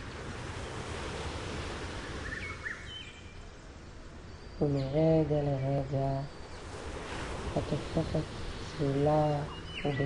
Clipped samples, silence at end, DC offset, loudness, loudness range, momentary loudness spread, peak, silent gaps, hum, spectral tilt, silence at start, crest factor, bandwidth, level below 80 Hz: under 0.1%; 0 s; under 0.1%; -34 LUFS; 8 LU; 20 LU; -16 dBFS; none; none; -6.5 dB/octave; 0 s; 18 dB; 11 kHz; -46 dBFS